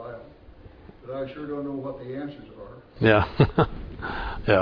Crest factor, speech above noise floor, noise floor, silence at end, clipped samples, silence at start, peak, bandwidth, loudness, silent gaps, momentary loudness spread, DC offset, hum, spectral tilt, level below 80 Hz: 22 dB; 23 dB; -48 dBFS; 0 s; under 0.1%; 0 s; -4 dBFS; 5.4 kHz; -26 LUFS; none; 23 LU; under 0.1%; none; -9 dB/octave; -42 dBFS